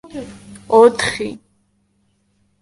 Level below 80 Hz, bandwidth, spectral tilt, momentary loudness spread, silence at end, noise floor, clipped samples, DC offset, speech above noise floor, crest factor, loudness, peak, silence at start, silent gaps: -52 dBFS; 11.5 kHz; -4 dB/octave; 21 LU; 1.25 s; -63 dBFS; under 0.1%; under 0.1%; 48 dB; 18 dB; -15 LUFS; 0 dBFS; 0.05 s; none